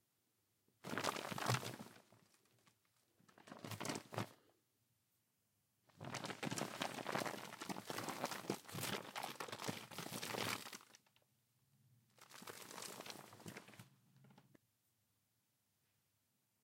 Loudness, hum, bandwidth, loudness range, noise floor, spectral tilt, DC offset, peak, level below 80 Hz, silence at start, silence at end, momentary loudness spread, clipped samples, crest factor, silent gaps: -46 LUFS; none; 16.5 kHz; 10 LU; -84 dBFS; -3.5 dB/octave; under 0.1%; -20 dBFS; under -90 dBFS; 0.85 s; 2.2 s; 15 LU; under 0.1%; 30 dB; none